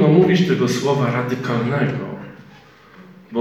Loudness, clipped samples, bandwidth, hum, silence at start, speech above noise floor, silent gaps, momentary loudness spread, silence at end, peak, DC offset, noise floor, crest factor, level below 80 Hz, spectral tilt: -18 LUFS; under 0.1%; 14 kHz; none; 0 s; 28 dB; none; 16 LU; 0 s; -2 dBFS; under 0.1%; -46 dBFS; 18 dB; -56 dBFS; -7 dB/octave